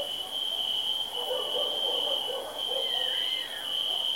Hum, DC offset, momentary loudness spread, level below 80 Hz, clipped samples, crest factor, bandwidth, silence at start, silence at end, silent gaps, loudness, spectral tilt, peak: none; 0.1%; 4 LU; -70 dBFS; under 0.1%; 14 dB; 16.5 kHz; 0 s; 0 s; none; -28 LUFS; 0 dB/octave; -18 dBFS